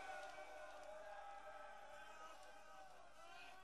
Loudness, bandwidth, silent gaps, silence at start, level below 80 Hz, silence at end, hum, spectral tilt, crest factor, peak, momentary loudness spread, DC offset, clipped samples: -58 LUFS; 13 kHz; none; 0 s; -80 dBFS; 0 s; none; -2 dB/octave; 16 dB; -42 dBFS; 7 LU; under 0.1%; under 0.1%